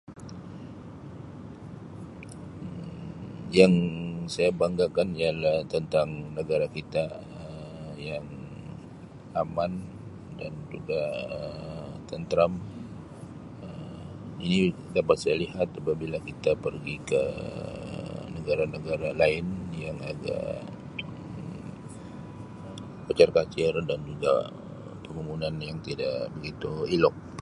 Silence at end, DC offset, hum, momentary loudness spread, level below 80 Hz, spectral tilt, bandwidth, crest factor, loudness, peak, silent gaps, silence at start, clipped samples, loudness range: 0 s; under 0.1%; none; 18 LU; -52 dBFS; -6.5 dB/octave; 11.5 kHz; 26 dB; -29 LUFS; -4 dBFS; none; 0.1 s; under 0.1%; 9 LU